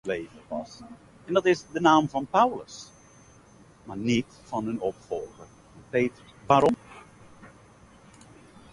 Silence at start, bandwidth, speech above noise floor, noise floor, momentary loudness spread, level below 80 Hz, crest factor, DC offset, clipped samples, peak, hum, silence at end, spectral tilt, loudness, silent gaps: 0.05 s; 11.5 kHz; 28 dB; -54 dBFS; 22 LU; -60 dBFS; 22 dB; under 0.1%; under 0.1%; -6 dBFS; none; 1.25 s; -5.5 dB/octave; -26 LUFS; none